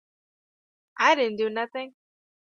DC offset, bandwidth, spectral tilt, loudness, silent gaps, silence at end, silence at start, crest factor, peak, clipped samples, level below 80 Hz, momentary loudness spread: under 0.1%; 7.2 kHz; -3 dB/octave; -24 LUFS; none; 0.55 s; 0.95 s; 22 dB; -6 dBFS; under 0.1%; -80 dBFS; 15 LU